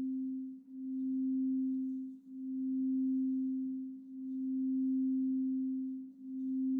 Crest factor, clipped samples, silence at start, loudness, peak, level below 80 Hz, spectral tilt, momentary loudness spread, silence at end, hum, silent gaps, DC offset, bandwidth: 6 dB; under 0.1%; 0 s; -37 LUFS; -30 dBFS; under -90 dBFS; -10.5 dB/octave; 12 LU; 0 s; none; none; under 0.1%; 0.6 kHz